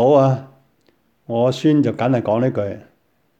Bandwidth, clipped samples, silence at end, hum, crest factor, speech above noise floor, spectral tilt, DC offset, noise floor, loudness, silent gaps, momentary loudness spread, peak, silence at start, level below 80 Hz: 8.6 kHz; under 0.1%; 0.6 s; none; 18 dB; 46 dB; -8 dB/octave; under 0.1%; -62 dBFS; -18 LUFS; none; 11 LU; -2 dBFS; 0 s; -62 dBFS